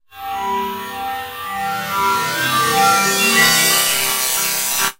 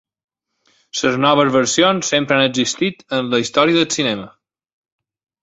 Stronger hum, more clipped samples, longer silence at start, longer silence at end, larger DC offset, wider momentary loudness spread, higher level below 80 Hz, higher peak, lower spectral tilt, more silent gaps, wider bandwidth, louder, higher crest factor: neither; neither; second, 0.15 s vs 0.95 s; second, 0.05 s vs 1.15 s; neither; first, 14 LU vs 7 LU; first, -52 dBFS vs -58 dBFS; about the same, 0 dBFS vs -2 dBFS; second, -0.5 dB/octave vs -3.5 dB/octave; neither; first, 16 kHz vs 8.2 kHz; about the same, -15 LUFS vs -16 LUFS; about the same, 18 dB vs 16 dB